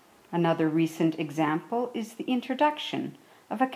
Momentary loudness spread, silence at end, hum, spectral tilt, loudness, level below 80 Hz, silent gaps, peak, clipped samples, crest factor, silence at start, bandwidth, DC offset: 9 LU; 0 s; none; -6.5 dB/octave; -28 LUFS; -80 dBFS; none; -12 dBFS; under 0.1%; 16 dB; 0.3 s; 15 kHz; under 0.1%